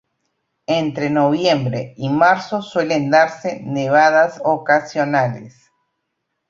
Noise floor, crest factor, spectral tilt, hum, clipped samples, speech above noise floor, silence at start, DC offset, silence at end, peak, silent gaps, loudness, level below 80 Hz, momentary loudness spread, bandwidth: -75 dBFS; 16 dB; -6 dB/octave; none; under 0.1%; 58 dB; 0.7 s; under 0.1%; 1 s; -2 dBFS; none; -17 LUFS; -60 dBFS; 10 LU; 7.6 kHz